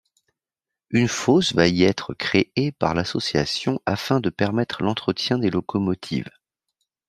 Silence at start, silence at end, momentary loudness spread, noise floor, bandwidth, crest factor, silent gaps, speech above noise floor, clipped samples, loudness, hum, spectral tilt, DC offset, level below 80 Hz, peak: 0.9 s; 0.8 s; 7 LU; -88 dBFS; 13.5 kHz; 20 dB; none; 66 dB; under 0.1%; -22 LUFS; none; -5.5 dB/octave; under 0.1%; -54 dBFS; -2 dBFS